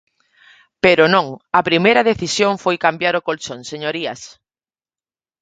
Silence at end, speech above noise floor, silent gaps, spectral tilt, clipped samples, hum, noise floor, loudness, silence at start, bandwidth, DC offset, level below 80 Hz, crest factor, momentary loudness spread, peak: 1.15 s; over 73 dB; none; -4 dB/octave; under 0.1%; none; under -90 dBFS; -16 LUFS; 0.85 s; 9.2 kHz; under 0.1%; -56 dBFS; 18 dB; 13 LU; 0 dBFS